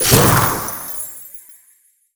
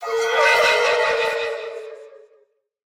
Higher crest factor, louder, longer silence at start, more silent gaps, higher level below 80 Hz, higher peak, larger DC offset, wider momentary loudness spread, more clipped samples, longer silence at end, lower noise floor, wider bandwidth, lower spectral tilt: about the same, 18 dB vs 16 dB; first, -15 LUFS vs -18 LUFS; about the same, 0 s vs 0 s; neither; first, -38 dBFS vs -64 dBFS; first, 0 dBFS vs -6 dBFS; neither; first, 23 LU vs 19 LU; neither; second, 0.6 s vs 0.85 s; second, -55 dBFS vs -61 dBFS; about the same, over 20 kHz vs 18.5 kHz; first, -3.5 dB/octave vs 0.5 dB/octave